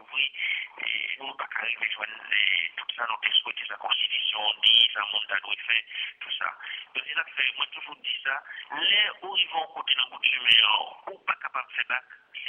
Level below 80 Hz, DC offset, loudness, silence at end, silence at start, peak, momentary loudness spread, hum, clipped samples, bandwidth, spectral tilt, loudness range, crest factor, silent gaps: -78 dBFS; under 0.1%; -25 LUFS; 0 s; 0 s; -6 dBFS; 14 LU; none; under 0.1%; 9.6 kHz; -0.5 dB/octave; 5 LU; 22 dB; none